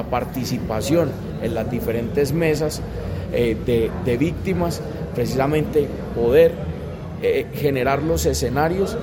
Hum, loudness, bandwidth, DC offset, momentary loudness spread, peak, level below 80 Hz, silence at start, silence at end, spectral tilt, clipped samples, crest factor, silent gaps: none; -21 LUFS; 17 kHz; under 0.1%; 9 LU; -4 dBFS; -36 dBFS; 0 s; 0 s; -6 dB/octave; under 0.1%; 16 dB; none